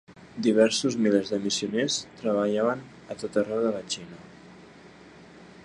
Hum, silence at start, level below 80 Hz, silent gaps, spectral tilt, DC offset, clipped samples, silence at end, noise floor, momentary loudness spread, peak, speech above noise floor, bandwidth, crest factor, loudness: none; 0.1 s; -66 dBFS; none; -4 dB/octave; under 0.1%; under 0.1%; 0.15 s; -50 dBFS; 15 LU; -8 dBFS; 24 dB; 11 kHz; 20 dB; -26 LUFS